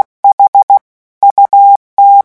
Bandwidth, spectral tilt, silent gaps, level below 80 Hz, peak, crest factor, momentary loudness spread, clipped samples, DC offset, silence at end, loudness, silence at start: 1.6 kHz; -4 dB/octave; 0.33-0.38 s, 0.48-0.53 s, 0.63-0.68 s, 0.81-1.21 s, 1.31-1.36 s, 1.76-1.97 s; -60 dBFS; 0 dBFS; 8 dB; 5 LU; 0.7%; under 0.1%; 0.05 s; -7 LUFS; 0.25 s